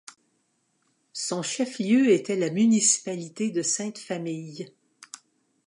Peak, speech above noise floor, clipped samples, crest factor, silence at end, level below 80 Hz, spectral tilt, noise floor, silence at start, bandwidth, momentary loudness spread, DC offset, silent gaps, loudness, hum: -8 dBFS; 47 dB; under 0.1%; 18 dB; 1 s; -80 dBFS; -3.5 dB/octave; -72 dBFS; 1.15 s; 11.5 kHz; 22 LU; under 0.1%; none; -25 LUFS; none